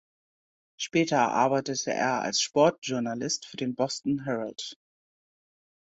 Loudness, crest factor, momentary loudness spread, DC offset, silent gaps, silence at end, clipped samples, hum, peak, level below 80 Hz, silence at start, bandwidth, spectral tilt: -27 LUFS; 20 dB; 10 LU; under 0.1%; 2.78-2.82 s; 1.2 s; under 0.1%; none; -8 dBFS; -70 dBFS; 0.8 s; 8.2 kHz; -3.5 dB/octave